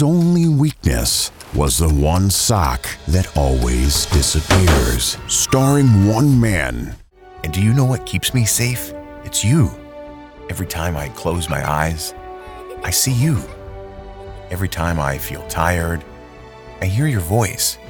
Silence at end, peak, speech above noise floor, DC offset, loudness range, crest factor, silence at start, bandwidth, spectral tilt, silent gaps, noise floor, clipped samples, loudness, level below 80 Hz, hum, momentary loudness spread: 0 s; -2 dBFS; 22 dB; under 0.1%; 7 LU; 16 dB; 0 s; 19.5 kHz; -4.5 dB/octave; none; -38 dBFS; under 0.1%; -17 LUFS; -28 dBFS; none; 19 LU